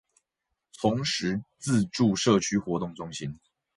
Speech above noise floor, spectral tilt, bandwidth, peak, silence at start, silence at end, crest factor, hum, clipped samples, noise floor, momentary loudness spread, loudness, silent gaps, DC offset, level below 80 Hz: 57 dB; -5 dB/octave; 11.5 kHz; -10 dBFS; 0.8 s; 0.4 s; 18 dB; none; under 0.1%; -83 dBFS; 12 LU; -27 LUFS; none; under 0.1%; -58 dBFS